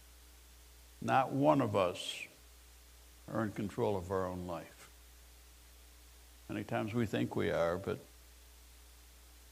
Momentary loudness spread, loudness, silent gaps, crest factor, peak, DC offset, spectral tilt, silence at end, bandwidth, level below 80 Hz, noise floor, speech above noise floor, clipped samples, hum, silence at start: 26 LU; -36 LUFS; none; 22 dB; -16 dBFS; under 0.1%; -6 dB/octave; 0 s; 15.5 kHz; -62 dBFS; -59 dBFS; 24 dB; under 0.1%; none; 0 s